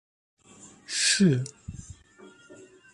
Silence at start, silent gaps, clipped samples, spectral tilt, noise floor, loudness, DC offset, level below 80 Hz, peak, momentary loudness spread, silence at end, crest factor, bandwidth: 0.65 s; none; under 0.1%; -3.5 dB/octave; -53 dBFS; -24 LUFS; under 0.1%; -56 dBFS; -10 dBFS; 24 LU; 0.4 s; 20 dB; 11.5 kHz